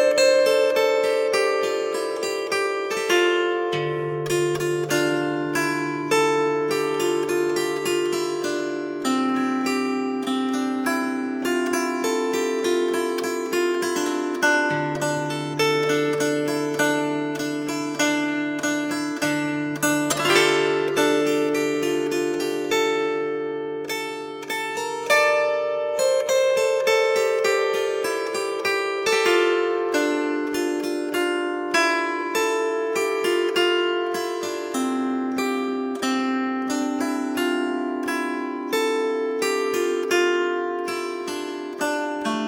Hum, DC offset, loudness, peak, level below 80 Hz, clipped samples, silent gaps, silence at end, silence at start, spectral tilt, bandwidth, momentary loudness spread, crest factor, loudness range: none; under 0.1%; -23 LUFS; -4 dBFS; -68 dBFS; under 0.1%; none; 0 s; 0 s; -3.5 dB/octave; 17 kHz; 7 LU; 18 dB; 3 LU